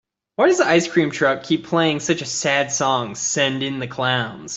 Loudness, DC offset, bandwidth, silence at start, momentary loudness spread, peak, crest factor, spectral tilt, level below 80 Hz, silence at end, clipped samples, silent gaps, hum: -19 LUFS; under 0.1%; 8.2 kHz; 0.4 s; 7 LU; -2 dBFS; 18 dB; -3.5 dB/octave; -60 dBFS; 0 s; under 0.1%; none; none